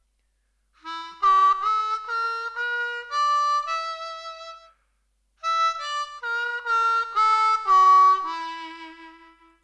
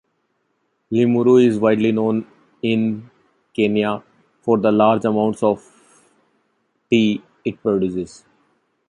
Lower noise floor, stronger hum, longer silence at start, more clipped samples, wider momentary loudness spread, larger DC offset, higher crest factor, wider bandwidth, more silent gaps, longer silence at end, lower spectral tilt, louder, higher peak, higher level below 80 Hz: about the same, -70 dBFS vs -69 dBFS; neither; about the same, 0.85 s vs 0.9 s; neither; first, 19 LU vs 15 LU; neither; about the same, 14 dB vs 16 dB; about the same, 9.8 kHz vs 10.5 kHz; neither; second, 0.55 s vs 0.8 s; second, 0.5 dB/octave vs -7 dB/octave; second, -22 LUFS vs -18 LUFS; second, -10 dBFS vs -2 dBFS; second, -68 dBFS vs -58 dBFS